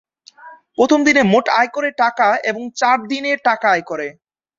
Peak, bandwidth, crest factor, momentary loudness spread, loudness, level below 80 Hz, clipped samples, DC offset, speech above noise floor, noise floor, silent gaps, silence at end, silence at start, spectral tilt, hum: -2 dBFS; 7.6 kHz; 16 dB; 12 LU; -16 LUFS; -60 dBFS; under 0.1%; under 0.1%; 26 dB; -42 dBFS; none; 0.45 s; 0.4 s; -4.5 dB/octave; none